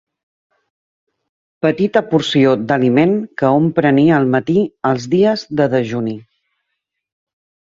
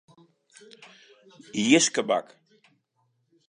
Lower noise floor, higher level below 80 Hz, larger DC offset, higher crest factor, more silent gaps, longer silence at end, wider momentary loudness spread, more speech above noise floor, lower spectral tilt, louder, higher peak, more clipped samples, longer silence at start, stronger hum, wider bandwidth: about the same, -76 dBFS vs -73 dBFS; first, -56 dBFS vs -80 dBFS; neither; second, 16 dB vs 26 dB; neither; first, 1.55 s vs 1.3 s; second, 7 LU vs 10 LU; first, 61 dB vs 49 dB; first, -7 dB/octave vs -2.5 dB/octave; first, -15 LUFS vs -23 LUFS; about the same, -2 dBFS vs -4 dBFS; neither; about the same, 1.65 s vs 1.55 s; neither; second, 7.8 kHz vs 10.5 kHz